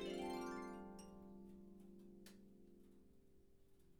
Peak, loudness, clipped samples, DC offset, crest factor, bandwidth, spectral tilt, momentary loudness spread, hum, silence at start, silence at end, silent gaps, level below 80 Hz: -36 dBFS; -53 LUFS; under 0.1%; under 0.1%; 18 dB; over 20 kHz; -5 dB/octave; 20 LU; none; 0 s; 0 s; none; -72 dBFS